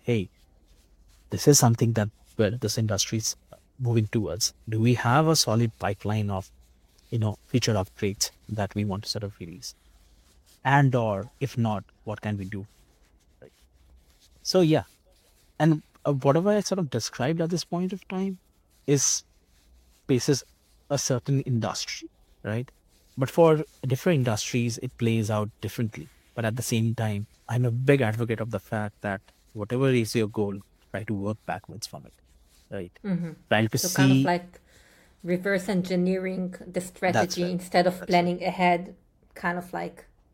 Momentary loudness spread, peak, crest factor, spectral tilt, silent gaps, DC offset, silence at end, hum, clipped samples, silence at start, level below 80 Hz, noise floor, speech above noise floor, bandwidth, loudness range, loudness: 15 LU; -6 dBFS; 22 dB; -5 dB/octave; none; under 0.1%; 0.3 s; none; under 0.1%; 0.05 s; -58 dBFS; -61 dBFS; 35 dB; 16.5 kHz; 5 LU; -26 LUFS